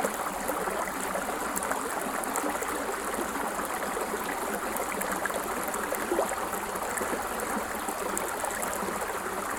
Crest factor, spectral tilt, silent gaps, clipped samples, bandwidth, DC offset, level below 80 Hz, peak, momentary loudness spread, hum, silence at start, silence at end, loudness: 24 dB; -2.5 dB/octave; none; under 0.1%; 19 kHz; under 0.1%; -54 dBFS; -8 dBFS; 2 LU; none; 0 s; 0 s; -31 LUFS